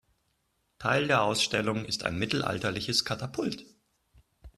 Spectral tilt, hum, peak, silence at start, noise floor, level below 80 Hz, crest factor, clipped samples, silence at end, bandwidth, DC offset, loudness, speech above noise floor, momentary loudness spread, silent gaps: -4 dB/octave; none; -8 dBFS; 0.8 s; -75 dBFS; -58 dBFS; 22 dB; under 0.1%; 0.1 s; 13.5 kHz; under 0.1%; -29 LUFS; 46 dB; 9 LU; none